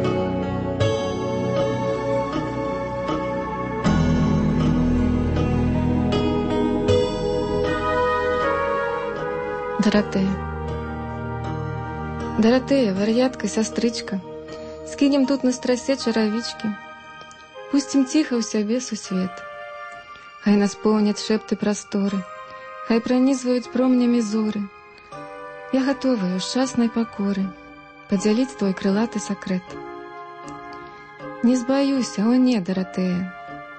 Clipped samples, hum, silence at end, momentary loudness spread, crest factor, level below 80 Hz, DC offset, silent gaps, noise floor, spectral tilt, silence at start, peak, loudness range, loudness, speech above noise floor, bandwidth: under 0.1%; none; 0 s; 17 LU; 16 dB; -40 dBFS; under 0.1%; none; -43 dBFS; -6 dB/octave; 0 s; -6 dBFS; 3 LU; -22 LUFS; 22 dB; 8.8 kHz